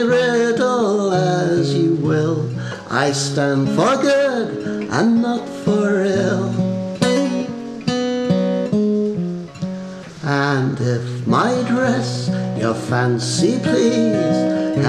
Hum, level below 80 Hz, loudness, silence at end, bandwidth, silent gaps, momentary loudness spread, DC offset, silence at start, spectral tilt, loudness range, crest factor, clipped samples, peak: none; -56 dBFS; -18 LUFS; 0 s; 12 kHz; none; 8 LU; under 0.1%; 0 s; -6 dB/octave; 2 LU; 18 dB; under 0.1%; 0 dBFS